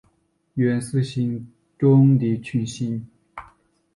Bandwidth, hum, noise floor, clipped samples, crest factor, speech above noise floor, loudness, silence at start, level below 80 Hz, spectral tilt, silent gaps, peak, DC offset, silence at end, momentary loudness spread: 11.5 kHz; none; -66 dBFS; under 0.1%; 16 dB; 46 dB; -21 LUFS; 0.55 s; -58 dBFS; -8 dB/octave; none; -6 dBFS; under 0.1%; 0.5 s; 25 LU